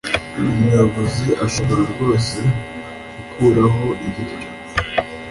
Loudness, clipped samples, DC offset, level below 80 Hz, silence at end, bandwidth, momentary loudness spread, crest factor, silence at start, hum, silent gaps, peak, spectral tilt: -18 LUFS; under 0.1%; under 0.1%; -38 dBFS; 0 s; 11.5 kHz; 16 LU; 16 dB; 0.05 s; none; none; -2 dBFS; -6 dB/octave